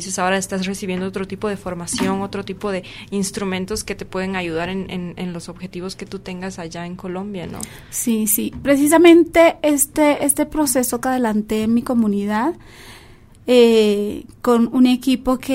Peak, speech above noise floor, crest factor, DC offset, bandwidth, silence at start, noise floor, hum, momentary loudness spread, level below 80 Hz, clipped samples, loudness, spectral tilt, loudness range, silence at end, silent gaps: 0 dBFS; 26 dB; 18 dB; under 0.1%; 16 kHz; 0 s; -44 dBFS; none; 16 LU; -46 dBFS; under 0.1%; -18 LUFS; -4.5 dB/octave; 12 LU; 0 s; none